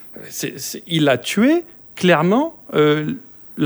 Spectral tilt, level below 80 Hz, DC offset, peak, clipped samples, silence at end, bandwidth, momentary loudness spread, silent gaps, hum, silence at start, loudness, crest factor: -5 dB/octave; -62 dBFS; under 0.1%; -2 dBFS; under 0.1%; 0 s; over 20 kHz; 15 LU; none; none; 0 s; -18 LUFS; 18 dB